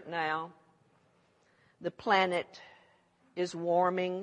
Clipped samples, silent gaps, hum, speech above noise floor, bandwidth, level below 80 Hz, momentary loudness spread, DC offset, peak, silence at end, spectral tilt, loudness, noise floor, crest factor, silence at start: under 0.1%; none; none; 37 dB; 10 kHz; -80 dBFS; 19 LU; under 0.1%; -12 dBFS; 0 s; -5 dB/octave; -31 LUFS; -69 dBFS; 22 dB; 0 s